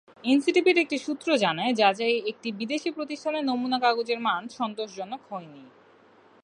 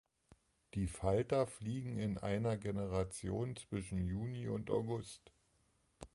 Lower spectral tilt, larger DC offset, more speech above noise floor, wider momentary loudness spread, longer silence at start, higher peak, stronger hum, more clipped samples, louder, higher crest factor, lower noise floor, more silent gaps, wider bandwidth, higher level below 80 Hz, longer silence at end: second, -4 dB/octave vs -7 dB/octave; neither; second, 31 dB vs 37 dB; first, 13 LU vs 8 LU; second, 0.25 s vs 0.75 s; first, -6 dBFS vs -20 dBFS; neither; neither; first, -26 LUFS vs -40 LUFS; about the same, 20 dB vs 20 dB; second, -57 dBFS vs -76 dBFS; neither; about the same, 11 kHz vs 11.5 kHz; second, -80 dBFS vs -56 dBFS; first, 0.75 s vs 0.1 s